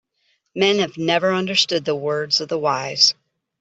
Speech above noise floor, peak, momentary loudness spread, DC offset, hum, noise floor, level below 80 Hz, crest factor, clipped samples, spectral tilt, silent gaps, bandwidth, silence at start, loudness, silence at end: 48 dB; -2 dBFS; 7 LU; under 0.1%; none; -67 dBFS; -66 dBFS; 18 dB; under 0.1%; -3 dB/octave; none; 8.2 kHz; 0.55 s; -18 LUFS; 0.5 s